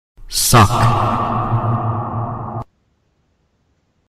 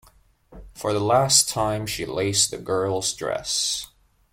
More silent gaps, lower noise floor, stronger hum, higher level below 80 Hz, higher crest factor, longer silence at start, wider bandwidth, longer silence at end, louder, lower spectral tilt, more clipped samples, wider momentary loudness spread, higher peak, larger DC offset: neither; first, -63 dBFS vs -56 dBFS; neither; first, -34 dBFS vs -50 dBFS; about the same, 16 dB vs 20 dB; second, 0.2 s vs 0.5 s; about the same, 16 kHz vs 16.5 kHz; first, 1.55 s vs 0.5 s; first, -16 LUFS vs -22 LUFS; first, -4.5 dB/octave vs -2.5 dB/octave; neither; first, 16 LU vs 11 LU; about the same, -2 dBFS vs -4 dBFS; neither